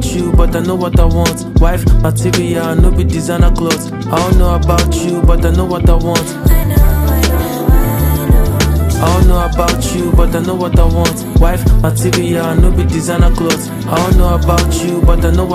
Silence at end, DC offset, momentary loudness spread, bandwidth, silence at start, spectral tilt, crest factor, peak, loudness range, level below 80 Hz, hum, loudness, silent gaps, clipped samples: 0 s; under 0.1%; 3 LU; 15.5 kHz; 0 s; -6 dB/octave; 10 dB; 0 dBFS; 1 LU; -12 dBFS; none; -12 LUFS; none; under 0.1%